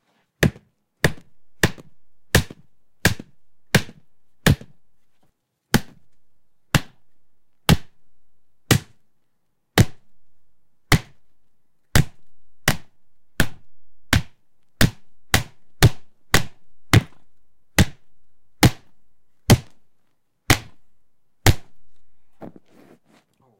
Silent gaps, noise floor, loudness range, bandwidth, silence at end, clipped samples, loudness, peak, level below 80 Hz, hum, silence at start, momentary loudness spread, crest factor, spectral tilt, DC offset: none; -71 dBFS; 4 LU; 16.5 kHz; 1.1 s; under 0.1%; -21 LUFS; -2 dBFS; -36 dBFS; none; 0.4 s; 10 LU; 20 dB; -4.5 dB/octave; under 0.1%